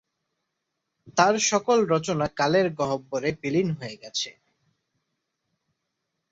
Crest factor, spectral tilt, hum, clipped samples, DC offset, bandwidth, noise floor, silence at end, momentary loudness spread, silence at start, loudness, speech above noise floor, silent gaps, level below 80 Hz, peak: 22 dB; -4 dB/octave; none; under 0.1%; under 0.1%; 8 kHz; -81 dBFS; 2 s; 10 LU; 1.05 s; -24 LUFS; 57 dB; none; -62 dBFS; -4 dBFS